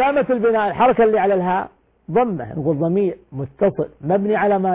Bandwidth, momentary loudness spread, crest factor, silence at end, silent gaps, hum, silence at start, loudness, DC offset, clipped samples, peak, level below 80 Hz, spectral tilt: 4 kHz; 8 LU; 12 dB; 0 s; none; none; 0 s; -18 LUFS; under 0.1%; under 0.1%; -6 dBFS; -52 dBFS; -11 dB/octave